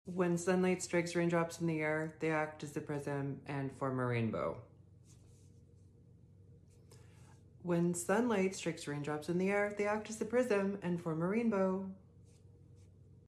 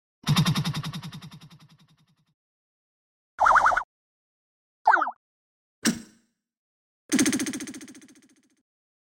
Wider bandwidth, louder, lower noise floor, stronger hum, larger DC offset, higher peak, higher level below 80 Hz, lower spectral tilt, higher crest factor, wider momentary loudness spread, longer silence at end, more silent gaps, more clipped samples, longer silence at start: second, 13 kHz vs 16.5 kHz; second, -36 LUFS vs -24 LUFS; second, -61 dBFS vs -66 dBFS; neither; neither; second, -20 dBFS vs -8 dBFS; second, -70 dBFS vs -58 dBFS; first, -6 dB/octave vs -4 dB/octave; about the same, 18 dB vs 20 dB; second, 8 LU vs 22 LU; second, 0.4 s vs 1.05 s; second, none vs 2.34-3.38 s, 3.84-4.85 s, 5.16-5.82 s, 6.57-7.09 s; neither; second, 0.05 s vs 0.25 s